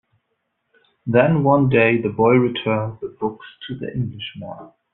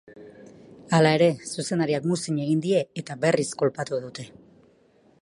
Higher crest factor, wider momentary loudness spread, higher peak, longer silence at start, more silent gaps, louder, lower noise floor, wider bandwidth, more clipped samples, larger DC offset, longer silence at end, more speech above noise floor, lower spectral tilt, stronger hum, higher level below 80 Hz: about the same, 18 dB vs 20 dB; first, 18 LU vs 13 LU; first, -2 dBFS vs -6 dBFS; first, 1.05 s vs 0.1 s; neither; first, -19 LUFS vs -24 LUFS; first, -73 dBFS vs -59 dBFS; second, 4.1 kHz vs 11.5 kHz; neither; neither; second, 0.25 s vs 0.95 s; first, 54 dB vs 36 dB; about the same, -6 dB/octave vs -5.5 dB/octave; neither; first, -54 dBFS vs -68 dBFS